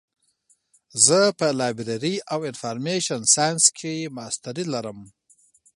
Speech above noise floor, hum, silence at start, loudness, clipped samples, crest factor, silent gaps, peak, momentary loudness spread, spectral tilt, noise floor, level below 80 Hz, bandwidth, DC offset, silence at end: 42 dB; none; 0.95 s; -21 LUFS; under 0.1%; 24 dB; none; 0 dBFS; 15 LU; -2.5 dB/octave; -65 dBFS; -68 dBFS; 16 kHz; under 0.1%; 0.65 s